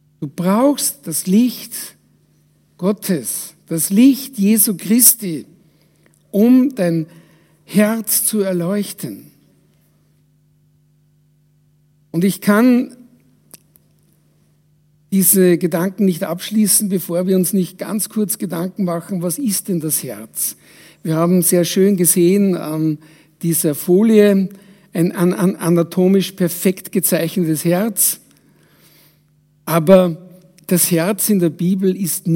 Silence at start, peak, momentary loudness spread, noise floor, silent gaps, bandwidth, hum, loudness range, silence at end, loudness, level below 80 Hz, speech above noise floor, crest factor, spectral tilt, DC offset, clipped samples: 0.2 s; 0 dBFS; 13 LU; -56 dBFS; none; 16.5 kHz; none; 5 LU; 0 s; -16 LUFS; -66 dBFS; 41 dB; 18 dB; -5 dB/octave; under 0.1%; under 0.1%